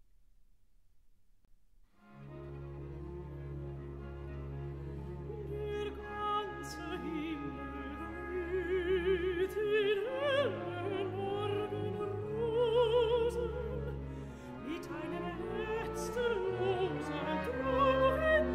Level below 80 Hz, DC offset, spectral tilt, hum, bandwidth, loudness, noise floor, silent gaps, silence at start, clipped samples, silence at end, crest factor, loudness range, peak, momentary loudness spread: -50 dBFS; under 0.1%; -6.5 dB/octave; none; 15 kHz; -36 LUFS; -67 dBFS; none; 2.05 s; under 0.1%; 0 s; 18 dB; 13 LU; -18 dBFS; 16 LU